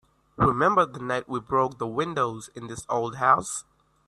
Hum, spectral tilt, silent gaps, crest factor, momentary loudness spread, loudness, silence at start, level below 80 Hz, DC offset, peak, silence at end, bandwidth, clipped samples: none; -5 dB/octave; none; 22 dB; 13 LU; -25 LUFS; 0.4 s; -52 dBFS; under 0.1%; -6 dBFS; 0.45 s; 12.5 kHz; under 0.1%